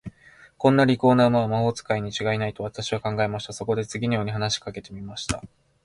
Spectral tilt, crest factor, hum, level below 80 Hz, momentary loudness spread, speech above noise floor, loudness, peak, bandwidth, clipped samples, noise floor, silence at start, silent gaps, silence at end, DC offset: -5.5 dB/octave; 20 dB; none; -50 dBFS; 14 LU; 29 dB; -24 LUFS; -4 dBFS; 11.5 kHz; under 0.1%; -53 dBFS; 0.05 s; none; 0.4 s; under 0.1%